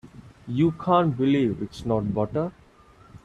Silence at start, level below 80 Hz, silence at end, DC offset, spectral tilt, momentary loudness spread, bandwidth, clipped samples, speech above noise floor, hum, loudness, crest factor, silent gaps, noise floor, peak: 0.05 s; -52 dBFS; 0.05 s; under 0.1%; -8.5 dB/octave; 11 LU; 10.5 kHz; under 0.1%; 30 dB; none; -24 LUFS; 18 dB; none; -53 dBFS; -6 dBFS